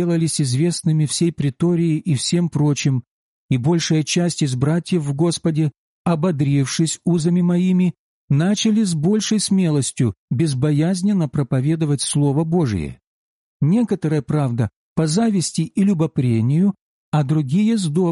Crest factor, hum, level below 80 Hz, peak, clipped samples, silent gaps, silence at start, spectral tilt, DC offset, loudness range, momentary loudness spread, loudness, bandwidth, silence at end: 10 dB; none; -52 dBFS; -8 dBFS; under 0.1%; 3.11-3.49 s, 5.78-6.05 s, 7.99-8.28 s, 10.18-10.28 s, 13.07-13.60 s, 14.76-14.96 s, 16.81-17.12 s; 0 s; -6 dB/octave; under 0.1%; 2 LU; 5 LU; -19 LUFS; 11.5 kHz; 0 s